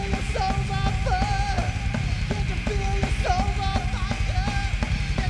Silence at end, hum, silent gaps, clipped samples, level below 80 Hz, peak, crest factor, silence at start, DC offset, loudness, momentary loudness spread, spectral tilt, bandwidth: 0 s; none; none; under 0.1%; -28 dBFS; -8 dBFS; 16 dB; 0 s; under 0.1%; -26 LUFS; 3 LU; -5.5 dB/octave; 11 kHz